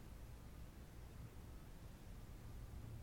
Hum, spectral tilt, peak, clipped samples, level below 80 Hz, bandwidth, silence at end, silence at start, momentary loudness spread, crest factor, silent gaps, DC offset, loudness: none; -6 dB/octave; -42 dBFS; under 0.1%; -58 dBFS; 19 kHz; 0 s; 0 s; 3 LU; 14 dB; none; under 0.1%; -58 LUFS